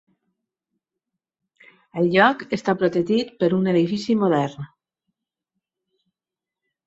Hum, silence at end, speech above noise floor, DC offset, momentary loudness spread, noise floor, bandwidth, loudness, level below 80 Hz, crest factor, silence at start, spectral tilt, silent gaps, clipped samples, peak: none; 2.2 s; 69 dB; under 0.1%; 12 LU; -89 dBFS; 8 kHz; -20 LUFS; -64 dBFS; 22 dB; 1.95 s; -7 dB/octave; none; under 0.1%; -2 dBFS